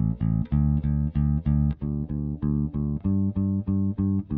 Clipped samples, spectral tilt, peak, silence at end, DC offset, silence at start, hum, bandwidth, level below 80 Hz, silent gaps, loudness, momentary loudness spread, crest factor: under 0.1%; -14 dB/octave; -12 dBFS; 0 s; under 0.1%; 0 s; none; 3 kHz; -32 dBFS; none; -26 LUFS; 5 LU; 12 dB